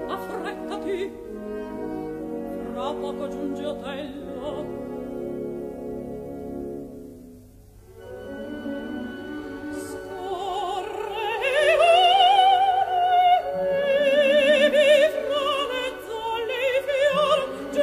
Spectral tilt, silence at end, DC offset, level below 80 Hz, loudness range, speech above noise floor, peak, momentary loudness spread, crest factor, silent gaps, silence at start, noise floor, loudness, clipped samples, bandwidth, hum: -4 dB/octave; 0 s; under 0.1%; -54 dBFS; 17 LU; 17 dB; -6 dBFS; 17 LU; 18 dB; none; 0 s; -48 dBFS; -23 LUFS; under 0.1%; 15 kHz; none